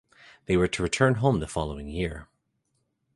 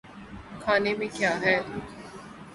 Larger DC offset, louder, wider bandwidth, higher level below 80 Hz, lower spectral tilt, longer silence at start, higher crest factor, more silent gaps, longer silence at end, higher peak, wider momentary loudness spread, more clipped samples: neither; about the same, -26 LUFS vs -26 LUFS; about the same, 11.5 kHz vs 11.5 kHz; first, -44 dBFS vs -56 dBFS; about the same, -5.5 dB/octave vs -4.5 dB/octave; first, 0.5 s vs 0.05 s; about the same, 20 dB vs 20 dB; neither; first, 0.9 s vs 0 s; about the same, -8 dBFS vs -10 dBFS; second, 11 LU vs 19 LU; neither